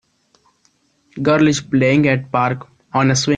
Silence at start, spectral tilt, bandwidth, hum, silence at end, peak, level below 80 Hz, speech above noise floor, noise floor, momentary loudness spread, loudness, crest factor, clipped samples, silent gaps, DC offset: 1.15 s; -5.5 dB/octave; 9.8 kHz; none; 0 s; -2 dBFS; -52 dBFS; 45 dB; -61 dBFS; 9 LU; -16 LUFS; 16 dB; under 0.1%; none; under 0.1%